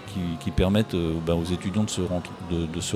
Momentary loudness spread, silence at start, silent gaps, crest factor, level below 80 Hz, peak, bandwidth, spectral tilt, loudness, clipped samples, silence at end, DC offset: 8 LU; 0 s; none; 18 dB; -40 dBFS; -8 dBFS; 15 kHz; -6 dB/octave; -26 LUFS; under 0.1%; 0 s; under 0.1%